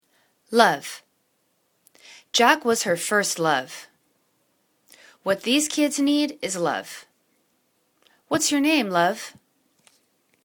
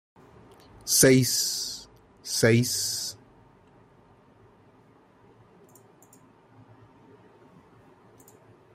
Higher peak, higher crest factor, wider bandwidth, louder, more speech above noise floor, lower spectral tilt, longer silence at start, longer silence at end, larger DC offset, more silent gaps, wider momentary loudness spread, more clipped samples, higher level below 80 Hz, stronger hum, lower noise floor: first, 0 dBFS vs -6 dBFS; about the same, 24 dB vs 24 dB; first, 19 kHz vs 16 kHz; about the same, -22 LUFS vs -23 LUFS; first, 48 dB vs 36 dB; about the same, -2.5 dB/octave vs -3.5 dB/octave; second, 0.5 s vs 0.85 s; second, 1.15 s vs 5.6 s; neither; neither; second, 18 LU vs 22 LU; neither; second, -72 dBFS vs -62 dBFS; neither; first, -69 dBFS vs -58 dBFS